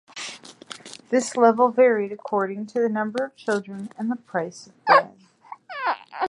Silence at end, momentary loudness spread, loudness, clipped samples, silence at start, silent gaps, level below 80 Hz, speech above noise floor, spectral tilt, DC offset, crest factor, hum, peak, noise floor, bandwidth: 0 s; 20 LU; -22 LUFS; under 0.1%; 0.15 s; none; -78 dBFS; 23 dB; -4.5 dB/octave; under 0.1%; 20 dB; none; -2 dBFS; -46 dBFS; 11.5 kHz